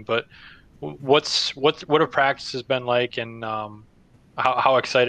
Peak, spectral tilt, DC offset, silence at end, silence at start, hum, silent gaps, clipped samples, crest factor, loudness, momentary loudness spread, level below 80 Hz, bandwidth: -4 dBFS; -4 dB/octave; under 0.1%; 0 s; 0 s; none; none; under 0.1%; 20 dB; -22 LUFS; 18 LU; -60 dBFS; 9.4 kHz